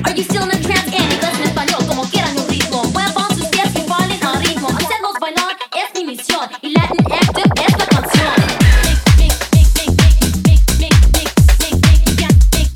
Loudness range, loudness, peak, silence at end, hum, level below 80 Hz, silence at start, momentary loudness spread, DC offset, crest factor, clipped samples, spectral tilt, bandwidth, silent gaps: 5 LU; -13 LUFS; 0 dBFS; 0 s; none; -16 dBFS; 0 s; 6 LU; under 0.1%; 12 dB; under 0.1%; -4.5 dB/octave; 18.5 kHz; none